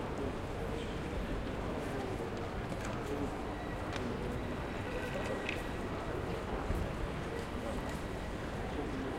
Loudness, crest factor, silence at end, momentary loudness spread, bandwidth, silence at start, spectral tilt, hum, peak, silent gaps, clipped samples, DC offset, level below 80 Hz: -39 LUFS; 18 dB; 0 s; 2 LU; 16.5 kHz; 0 s; -6 dB/octave; none; -20 dBFS; none; under 0.1%; under 0.1%; -46 dBFS